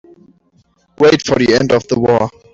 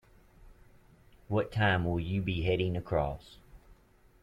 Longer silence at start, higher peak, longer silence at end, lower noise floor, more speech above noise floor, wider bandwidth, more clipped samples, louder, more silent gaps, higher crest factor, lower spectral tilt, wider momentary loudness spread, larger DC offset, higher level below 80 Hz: first, 1 s vs 0.4 s; first, -2 dBFS vs -14 dBFS; second, 0.25 s vs 0.5 s; second, -56 dBFS vs -62 dBFS; first, 43 dB vs 31 dB; second, 7.8 kHz vs 9.8 kHz; neither; first, -13 LUFS vs -31 LUFS; neither; second, 12 dB vs 20 dB; second, -5.5 dB/octave vs -8 dB/octave; second, 3 LU vs 6 LU; neither; about the same, -46 dBFS vs -50 dBFS